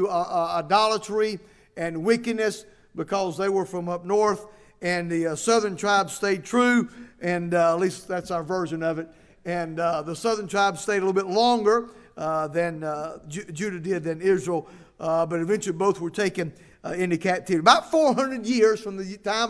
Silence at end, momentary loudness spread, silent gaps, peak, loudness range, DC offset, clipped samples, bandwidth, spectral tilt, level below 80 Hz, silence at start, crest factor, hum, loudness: 0 s; 12 LU; none; 0 dBFS; 4 LU; under 0.1%; under 0.1%; 11 kHz; -4.5 dB/octave; -60 dBFS; 0 s; 24 dB; none; -24 LUFS